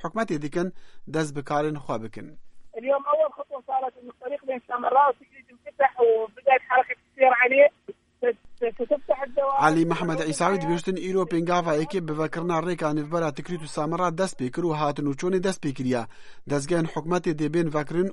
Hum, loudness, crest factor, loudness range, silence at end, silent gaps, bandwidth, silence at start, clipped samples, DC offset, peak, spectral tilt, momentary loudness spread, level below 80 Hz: none; -25 LUFS; 20 dB; 6 LU; 0 s; none; 11.5 kHz; 0 s; under 0.1%; under 0.1%; -4 dBFS; -6 dB/octave; 12 LU; -56 dBFS